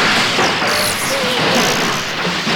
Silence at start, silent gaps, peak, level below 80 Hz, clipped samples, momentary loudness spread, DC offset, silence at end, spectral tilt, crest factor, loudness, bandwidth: 0 s; none; -2 dBFS; -46 dBFS; under 0.1%; 5 LU; under 0.1%; 0 s; -2.5 dB/octave; 14 dB; -14 LUFS; 19.5 kHz